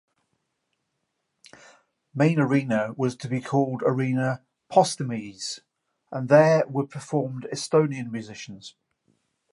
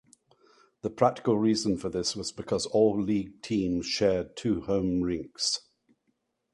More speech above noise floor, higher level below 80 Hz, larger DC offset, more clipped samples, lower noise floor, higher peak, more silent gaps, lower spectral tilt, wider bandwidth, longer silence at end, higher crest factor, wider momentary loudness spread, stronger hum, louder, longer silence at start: first, 54 dB vs 49 dB; second, -72 dBFS vs -54 dBFS; neither; neither; about the same, -78 dBFS vs -76 dBFS; first, -2 dBFS vs -8 dBFS; neither; about the same, -6 dB/octave vs -5 dB/octave; about the same, 11.5 kHz vs 11.5 kHz; about the same, 0.85 s vs 0.95 s; about the same, 22 dB vs 20 dB; first, 16 LU vs 7 LU; neither; first, -24 LUFS vs -28 LUFS; first, 2.15 s vs 0.85 s